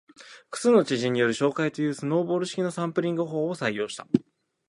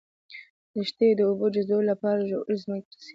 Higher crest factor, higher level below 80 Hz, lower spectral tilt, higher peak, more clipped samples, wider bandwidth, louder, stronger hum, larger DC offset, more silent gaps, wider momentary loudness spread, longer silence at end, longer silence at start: first, 22 dB vs 16 dB; about the same, -70 dBFS vs -74 dBFS; second, -5.5 dB/octave vs -7.5 dB/octave; first, -4 dBFS vs -12 dBFS; neither; first, 11.5 kHz vs 7.6 kHz; about the same, -26 LUFS vs -26 LUFS; neither; neither; second, none vs 0.50-0.74 s, 2.85-2.91 s; second, 7 LU vs 23 LU; first, 0.5 s vs 0.05 s; about the same, 0.2 s vs 0.3 s